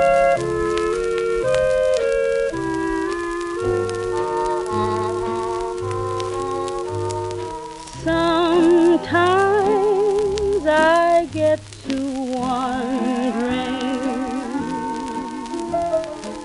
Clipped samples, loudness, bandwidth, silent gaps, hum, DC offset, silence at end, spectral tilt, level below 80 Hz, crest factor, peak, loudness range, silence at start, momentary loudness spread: under 0.1%; -20 LUFS; 11.5 kHz; none; none; under 0.1%; 0 s; -5.5 dB/octave; -44 dBFS; 16 dB; -4 dBFS; 7 LU; 0 s; 10 LU